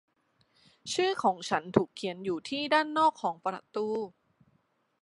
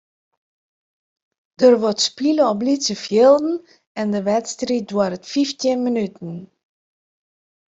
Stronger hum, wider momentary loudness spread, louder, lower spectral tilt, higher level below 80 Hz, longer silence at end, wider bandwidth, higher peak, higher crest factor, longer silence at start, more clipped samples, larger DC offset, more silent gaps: neither; second, 9 LU vs 14 LU; second, -30 LUFS vs -19 LUFS; about the same, -4.5 dB/octave vs -4.5 dB/octave; second, -70 dBFS vs -64 dBFS; second, 0.95 s vs 1.25 s; first, 11.5 kHz vs 8.2 kHz; second, -6 dBFS vs -2 dBFS; first, 24 dB vs 18 dB; second, 0.85 s vs 1.6 s; neither; neither; second, none vs 3.87-3.95 s